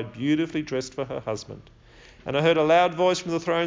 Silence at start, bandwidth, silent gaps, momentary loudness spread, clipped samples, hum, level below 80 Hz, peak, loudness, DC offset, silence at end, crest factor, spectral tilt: 0 s; 7.6 kHz; none; 16 LU; under 0.1%; none; -56 dBFS; -8 dBFS; -24 LUFS; under 0.1%; 0 s; 18 dB; -5.5 dB/octave